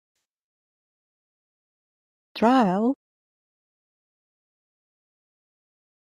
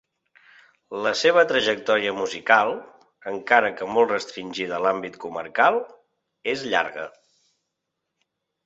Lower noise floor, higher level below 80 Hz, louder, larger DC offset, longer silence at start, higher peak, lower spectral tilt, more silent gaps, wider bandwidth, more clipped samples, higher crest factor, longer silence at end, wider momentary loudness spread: first, under -90 dBFS vs -81 dBFS; about the same, -72 dBFS vs -68 dBFS; about the same, -22 LUFS vs -22 LUFS; neither; first, 2.35 s vs 0.9 s; second, -8 dBFS vs -2 dBFS; first, -7 dB/octave vs -3 dB/octave; neither; first, 11.5 kHz vs 8 kHz; neither; about the same, 22 dB vs 22 dB; first, 3.2 s vs 1.6 s; about the same, 16 LU vs 15 LU